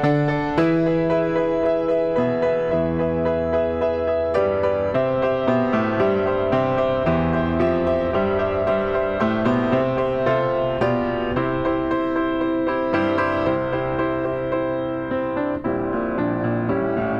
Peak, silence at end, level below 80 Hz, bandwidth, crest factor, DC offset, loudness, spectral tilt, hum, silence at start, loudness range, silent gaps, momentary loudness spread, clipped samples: -6 dBFS; 0 s; -44 dBFS; 7.4 kHz; 14 dB; under 0.1%; -21 LUFS; -8.5 dB/octave; none; 0 s; 2 LU; none; 4 LU; under 0.1%